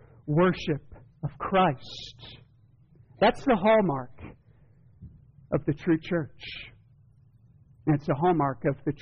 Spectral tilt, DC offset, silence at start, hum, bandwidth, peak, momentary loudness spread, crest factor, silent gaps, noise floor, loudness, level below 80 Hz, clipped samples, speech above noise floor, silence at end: -5.5 dB/octave; under 0.1%; 0.25 s; none; 6.8 kHz; -14 dBFS; 20 LU; 16 dB; none; -59 dBFS; -27 LUFS; -54 dBFS; under 0.1%; 33 dB; 0.05 s